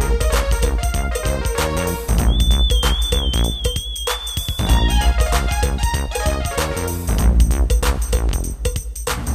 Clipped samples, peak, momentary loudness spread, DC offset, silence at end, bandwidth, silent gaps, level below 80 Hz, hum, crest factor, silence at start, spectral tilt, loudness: under 0.1%; -2 dBFS; 6 LU; under 0.1%; 0 s; 15.5 kHz; none; -18 dBFS; none; 14 dB; 0 s; -4 dB/octave; -19 LUFS